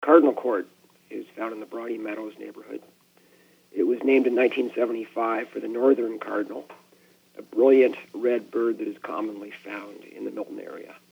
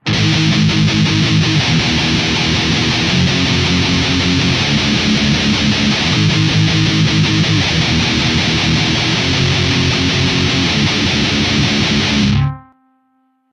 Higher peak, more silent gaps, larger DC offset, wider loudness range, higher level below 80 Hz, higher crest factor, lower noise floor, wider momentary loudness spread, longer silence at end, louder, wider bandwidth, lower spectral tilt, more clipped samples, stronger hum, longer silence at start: about the same, -2 dBFS vs 0 dBFS; neither; neither; first, 7 LU vs 0 LU; second, -88 dBFS vs -32 dBFS; first, 24 dB vs 14 dB; about the same, -59 dBFS vs -60 dBFS; first, 20 LU vs 1 LU; second, 0.15 s vs 0.9 s; second, -25 LUFS vs -13 LUFS; first, 16.5 kHz vs 10.5 kHz; first, -6 dB/octave vs -4.5 dB/octave; neither; neither; about the same, 0 s vs 0.05 s